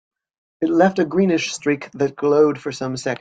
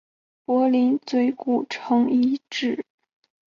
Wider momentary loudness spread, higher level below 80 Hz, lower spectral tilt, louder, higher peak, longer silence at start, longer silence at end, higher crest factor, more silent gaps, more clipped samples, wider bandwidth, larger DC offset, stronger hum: about the same, 9 LU vs 10 LU; first, -62 dBFS vs -70 dBFS; about the same, -5.5 dB/octave vs -5 dB/octave; first, -19 LUFS vs -22 LUFS; first, -2 dBFS vs -10 dBFS; about the same, 0.6 s vs 0.5 s; second, 0.05 s vs 0.7 s; about the same, 16 dB vs 12 dB; neither; neither; first, 9.2 kHz vs 7.2 kHz; neither; neither